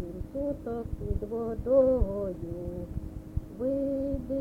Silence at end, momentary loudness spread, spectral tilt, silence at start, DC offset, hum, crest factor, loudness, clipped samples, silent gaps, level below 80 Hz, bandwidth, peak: 0 s; 14 LU; -10.5 dB/octave; 0 s; under 0.1%; none; 18 dB; -31 LUFS; under 0.1%; none; -40 dBFS; 5 kHz; -12 dBFS